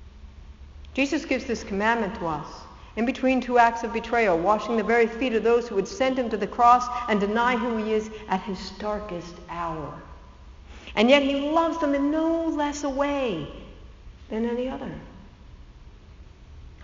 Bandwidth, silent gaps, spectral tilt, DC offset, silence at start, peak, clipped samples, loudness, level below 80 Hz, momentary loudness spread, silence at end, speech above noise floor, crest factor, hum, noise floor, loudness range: 7.6 kHz; none; -3.5 dB/octave; under 0.1%; 0 s; -4 dBFS; under 0.1%; -24 LUFS; -46 dBFS; 16 LU; 0 s; 23 dB; 22 dB; none; -47 dBFS; 9 LU